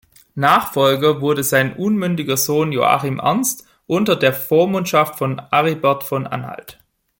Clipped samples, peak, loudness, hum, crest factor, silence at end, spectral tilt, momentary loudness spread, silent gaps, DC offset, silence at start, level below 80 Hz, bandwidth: under 0.1%; -2 dBFS; -17 LUFS; none; 16 dB; 0.5 s; -4.5 dB/octave; 9 LU; none; under 0.1%; 0.35 s; -58 dBFS; 17 kHz